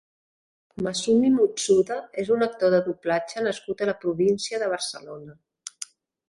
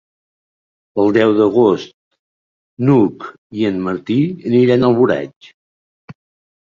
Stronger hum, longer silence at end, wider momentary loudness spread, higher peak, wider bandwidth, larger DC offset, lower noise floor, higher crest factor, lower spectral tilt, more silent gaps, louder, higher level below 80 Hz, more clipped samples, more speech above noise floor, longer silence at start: neither; about the same, 0.45 s vs 0.55 s; first, 18 LU vs 13 LU; second, -8 dBFS vs -2 dBFS; first, 11.5 kHz vs 7.2 kHz; neither; second, -43 dBFS vs under -90 dBFS; about the same, 16 dB vs 14 dB; second, -4.5 dB/octave vs -8.5 dB/octave; second, none vs 1.94-2.11 s, 2.19-2.77 s, 3.38-3.50 s, 5.36-5.41 s, 5.54-6.08 s; second, -24 LUFS vs -15 LUFS; second, -64 dBFS vs -54 dBFS; neither; second, 20 dB vs over 76 dB; second, 0.8 s vs 0.95 s